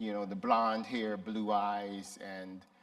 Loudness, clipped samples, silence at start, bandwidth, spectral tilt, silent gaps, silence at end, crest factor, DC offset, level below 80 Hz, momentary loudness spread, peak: -35 LUFS; under 0.1%; 0 s; 13 kHz; -5.5 dB/octave; none; 0.2 s; 22 dB; under 0.1%; -80 dBFS; 14 LU; -14 dBFS